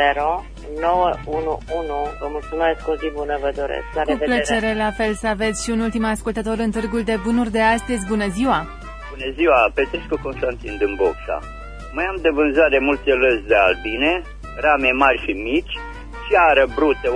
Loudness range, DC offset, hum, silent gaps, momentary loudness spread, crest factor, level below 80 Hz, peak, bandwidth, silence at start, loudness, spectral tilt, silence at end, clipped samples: 5 LU; under 0.1%; none; none; 12 LU; 18 dB; -36 dBFS; -2 dBFS; 11 kHz; 0 s; -19 LUFS; -4.5 dB/octave; 0 s; under 0.1%